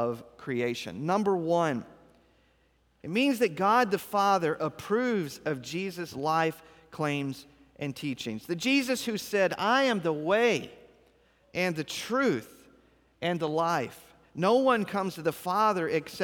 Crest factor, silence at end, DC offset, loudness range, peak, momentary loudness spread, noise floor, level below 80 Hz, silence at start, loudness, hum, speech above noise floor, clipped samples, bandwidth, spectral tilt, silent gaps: 18 dB; 0 s; under 0.1%; 4 LU; -12 dBFS; 11 LU; -67 dBFS; -68 dBFS; 0 s; -28 LUFS; none; 39 dB; under 0.1%; over 20 kHz; -5 dB/octave; none